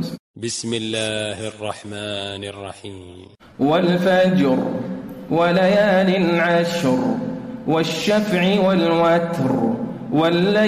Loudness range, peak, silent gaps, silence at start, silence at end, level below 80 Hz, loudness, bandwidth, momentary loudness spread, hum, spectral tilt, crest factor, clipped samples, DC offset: 8 LU; -8 dBFS; 0.19-0.34 s; 0 s; 0 s; -56 dBFS; -19 LUFS; 14.5 kHz; 14 LU; none; -5.5 dB/octave; 12 dB; under 0.1%; under 0.1%